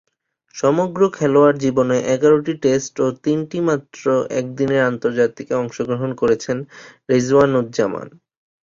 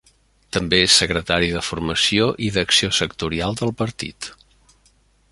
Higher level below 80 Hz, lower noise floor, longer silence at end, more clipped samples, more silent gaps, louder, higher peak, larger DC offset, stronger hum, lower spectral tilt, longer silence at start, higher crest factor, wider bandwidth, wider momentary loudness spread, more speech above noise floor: second, -56 dBFS vs -42 dBFS; second, -52 dBFS vs -58 dBFS; second, 0.55 s vs 1 s; neither; neither; about the same, -18 LUFS vs -18 LUFS; about the same, -2 dBFS vs 0 dBFS; neither; neither; first, -6 dB/octave vs -3 dB/octave; about the same, 0.55 s vs 0.55 s; about the same, 16 dB vs 20 dB; second, 7.6 kHz vs 11.5 kHz; second, 9 LU vs 13 LU; second, 34 dB vs 38 dB